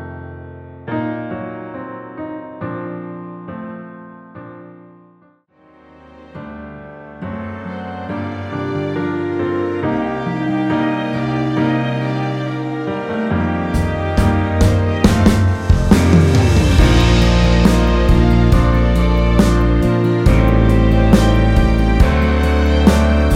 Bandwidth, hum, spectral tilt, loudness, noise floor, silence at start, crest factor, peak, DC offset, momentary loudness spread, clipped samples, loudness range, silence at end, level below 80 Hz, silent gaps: 14.5 kHz; none; -7 dB/octave; -15 LUFS; -52 dBFS; 0 s; 14 dB; 0 dBFS; under 0.1%; 19 LU; under 0.1%; 19 LU; 0 s; -20 dBFS; none